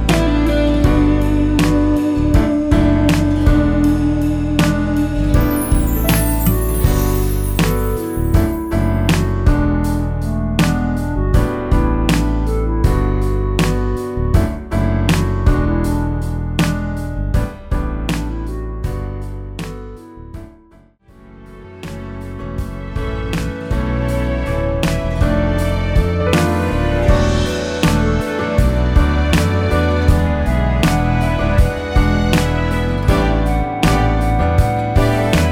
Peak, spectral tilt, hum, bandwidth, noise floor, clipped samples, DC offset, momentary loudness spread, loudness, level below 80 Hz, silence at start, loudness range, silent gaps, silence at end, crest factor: 0 dBFS; -6.5 dB/octave; none; over 20 kHz; -47 dBFS; under 0.1%; under 0.1%; 10 LU; -17 LUFS; -20 dBFS; 0 s; 10 LU; none; 0 s; 14 dB